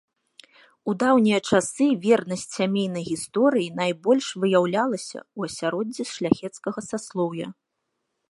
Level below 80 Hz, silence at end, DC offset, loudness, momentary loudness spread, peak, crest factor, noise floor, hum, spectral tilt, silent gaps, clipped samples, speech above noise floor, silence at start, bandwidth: -66 dBFS; 0.8 s; under 0.1%; -24 LUFS; 12 LU; -4 dBFS; 20 dB; -78 dBFS; none; -5 dB/octave; none; under 0.1%; 55 dB; 0.85 s; 11.5 kHz